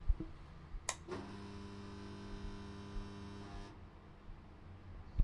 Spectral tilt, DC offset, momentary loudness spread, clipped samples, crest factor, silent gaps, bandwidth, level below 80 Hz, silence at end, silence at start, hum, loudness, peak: -4.5 dB/octave; under 0.1%; 13 LU; under 0.1%; 26 dB; none; 11 kHz; -48 dBFS; 0 s; 0 s; none; -49 LUFS; -18 dBFS